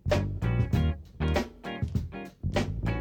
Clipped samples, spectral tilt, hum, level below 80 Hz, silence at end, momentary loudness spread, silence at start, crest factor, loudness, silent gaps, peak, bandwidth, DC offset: under 0.1%; -7 dB/octave; none; -36 dBFS; 0 s; 9 LU; 0.05 s; 16 dB; -31 LUFS; none; -12 dBFS; 16.5 kHz; under 0.1%